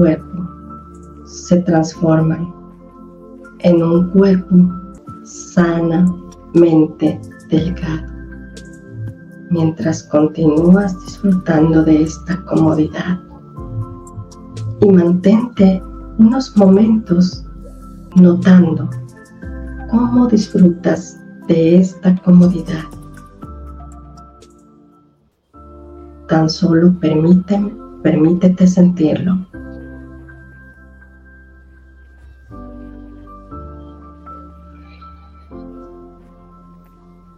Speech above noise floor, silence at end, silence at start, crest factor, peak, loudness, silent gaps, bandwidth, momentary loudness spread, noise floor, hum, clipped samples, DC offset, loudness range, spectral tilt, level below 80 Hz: 44 dB; 1.5 s; 0 s; 14 dB; 0 dBFS; -13 LUFS; none; 7.6 kHz; 24 LU; -56 dBFS; none; under 0.1%; under 0.1%; 6 LU; -8 dB/octave; -38 dBFS